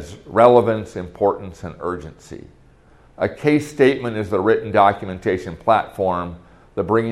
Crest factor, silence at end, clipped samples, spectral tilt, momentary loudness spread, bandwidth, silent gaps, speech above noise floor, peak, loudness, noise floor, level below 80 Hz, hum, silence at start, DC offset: 20 dB; 0 s; under 0.1%; -7 dB/octave; 17 LU; 12.5 kHz; none; 31 dB; 0 dBFS; -19 LUFS; -50 dBFS; -50 dBFS; none; 0 s; under 0.1%